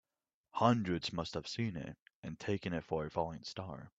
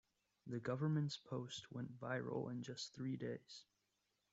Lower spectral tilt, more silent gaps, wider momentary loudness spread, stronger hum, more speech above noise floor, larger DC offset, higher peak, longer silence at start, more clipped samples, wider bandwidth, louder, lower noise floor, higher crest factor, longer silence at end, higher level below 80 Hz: about the same, -6 dB/octave vs -6 dB/octave; first, 2.02-2.06 s, 2.15-2.23 s vs none; first, 15 LU vs 12 LU; neither; first, 52 dB vs 41 dB; neither; first, -12 dBFS vs -30 dBFS; about the same, 0.55 s vs 0.45 s; neither; about the same, 8 kHz vs 8 kHz; first, -38 LUFS vs -46 LUFS; about the same, -89 dBFS vs -86 dBFS; first, 26 dB vs 16 dB; second, 0.1 s vs 0.7 s; first, -64 dBFS vs -82 dBFS